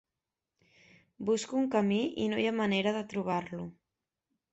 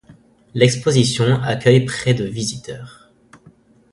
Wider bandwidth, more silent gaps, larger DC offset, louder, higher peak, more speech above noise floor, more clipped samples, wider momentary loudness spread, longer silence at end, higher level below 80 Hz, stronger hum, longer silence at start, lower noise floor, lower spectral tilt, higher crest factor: second, 8.2 kHz vs 11.5 kHz; neither; neither; second, -31 LUFS vs -17 LUFS; second, -16 dBFS vs 0 dBFS; first, 59 dB vs 33 dB; neither; second, 11 LU vs 16 LU; second, 0.8 s vs 1.05 s; second, -70 dBFS vs -50 dBFS; neither; first, 1.2 s vs 0.1 s; first, -90 dBFS vs -50 dBFS; about the same, -5.5 dB/octave vs -5.5 dB/octave; about the same, 16 dB vs 18 dB